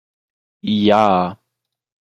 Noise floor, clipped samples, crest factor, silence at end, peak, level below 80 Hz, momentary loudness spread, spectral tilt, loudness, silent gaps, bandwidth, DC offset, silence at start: -79 dBFS; under 0.1%; 18 dB; 0.75 s; -2 dBFS; -58 dBFS; 13 LU; -7 dB/octave; -16 LUFS; none; 7.6 kHz; under 0.1%; 0.65 s